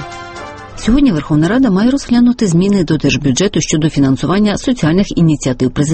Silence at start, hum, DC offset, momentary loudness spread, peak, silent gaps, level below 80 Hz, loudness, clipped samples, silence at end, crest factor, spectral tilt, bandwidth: 0 s; none; under 0.1%; 7 LU; 0 dBFS; none; -30 dBFS; -12 LUFS; under 0.1%; 0 s; 12 dB; -6 dB/octave; 8.8 kHz